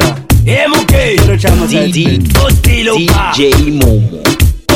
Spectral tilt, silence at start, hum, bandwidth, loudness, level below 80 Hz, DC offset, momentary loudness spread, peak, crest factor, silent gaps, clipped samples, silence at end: -5 dB/octave; 0 s; none; 17 kHz; -9 LUFS; -16 dBFS; under 0.1%; 2 LU; 0 dBFS; 8 dB; none; under 0.1%; 0 s